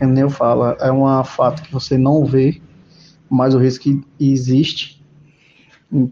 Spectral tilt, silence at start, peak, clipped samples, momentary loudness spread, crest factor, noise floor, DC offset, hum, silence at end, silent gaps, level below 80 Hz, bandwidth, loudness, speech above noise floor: -8 dB/octave; 0 s; -2 dBFS; under 0.1%; 7 LU; 14 dB; -51 dBFS; under 0.1%; none; 0 s; none; -50 dBFS; 7.2 kHz; -16 LUFS; 36 dB